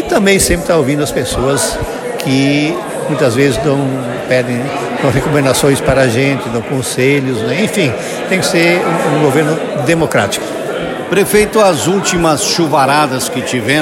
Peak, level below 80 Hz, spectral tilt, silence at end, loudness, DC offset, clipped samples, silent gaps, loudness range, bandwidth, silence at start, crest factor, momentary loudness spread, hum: 0 dBFS; -34 dBFS; -4.5 dB/octave; 0 s; -12 LUFS; under 0.1%; under 0.1%; none; 2 LU; 17 kHz; 0 s; 12 dB; 7 LU; none